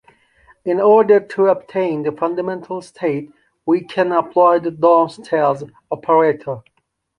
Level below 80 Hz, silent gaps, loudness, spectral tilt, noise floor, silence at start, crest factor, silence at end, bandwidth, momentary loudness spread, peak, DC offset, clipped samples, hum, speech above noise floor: -64 dBFS; none; -17 LUFS; -7.5 dB/octave; -53 dBFS; 0.65 s; 16 dB; 0.6 s; 10.5 kHz; 14 LU; -2 dBFS; under 0.1%; under 0.1%; none; 37 dB